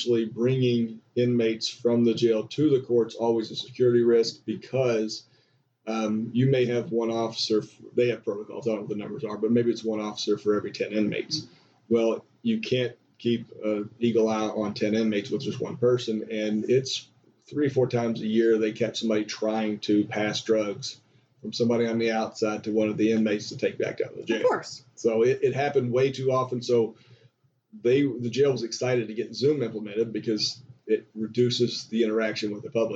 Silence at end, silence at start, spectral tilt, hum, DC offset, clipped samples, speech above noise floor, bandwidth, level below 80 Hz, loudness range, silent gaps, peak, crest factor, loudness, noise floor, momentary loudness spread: 0 s; 0 s; -6 dB/octave; none; under 0.1%; under 0.1%; 41 dB; 8 kHz; -72 dBFS; 3 LU; none; -12 dBFS; 14 dB; -26 LUFS; -66 dBFS; 8 LU